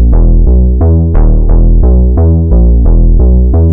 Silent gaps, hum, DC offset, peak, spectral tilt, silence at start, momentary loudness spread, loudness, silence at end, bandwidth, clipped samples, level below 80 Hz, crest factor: none; none; under 0.1%; 0 dBFS; -15.5 dB/octave; 0 s; 2 LU; -8 LUFS; 0 s; 1.7 kHz; under 0.1%; -6 dBFS; 4 dB